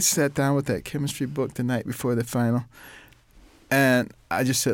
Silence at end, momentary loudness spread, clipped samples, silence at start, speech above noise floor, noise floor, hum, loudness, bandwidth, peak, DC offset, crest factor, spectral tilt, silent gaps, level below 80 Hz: 0 s; 8 LU; under 0.1%; 0 s; 29 dB; -53 dBFS; none; -24 LUFS; 17 kHz; -8 dBFS; under 0.1%; 16 dB; -4.5 dB/octave; none; -56 dBFS